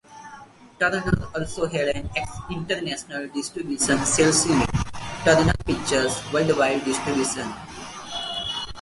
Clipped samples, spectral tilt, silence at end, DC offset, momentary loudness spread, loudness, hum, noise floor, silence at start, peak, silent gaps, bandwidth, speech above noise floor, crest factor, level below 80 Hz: under 0.1%; -3.5 dB/octave; 0 s; under 0.1%; 14 LU; -23 LUFS; none; -46 dBFS; 0.1 s; -2 dBFS; none; 11.5 kHz; 23 dB; 22 dB; -40 dBFS